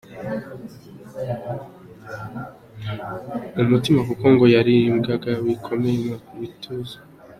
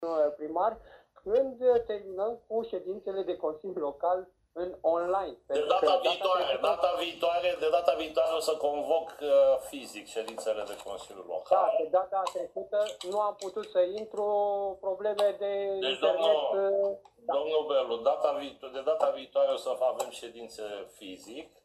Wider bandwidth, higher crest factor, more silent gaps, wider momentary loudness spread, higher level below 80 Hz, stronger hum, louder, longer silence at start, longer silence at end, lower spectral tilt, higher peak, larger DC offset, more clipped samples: about the same, 14 kHz vs 14 kHz; about the same, 20 dB vs 20 dB; neither; first, 22 LU vs 13 LU; first, -54 dBFS vs -68 dBFS; neither; first, -21 LUFS vs -30 LUFS; about the same, 0.1 s vs 0 s; second, 0.05 s vs 0.2 s; first, -7.5 dB/octave vs -3 dB/octave; first, -2 dBFS vs -10 dBFS; neither; neither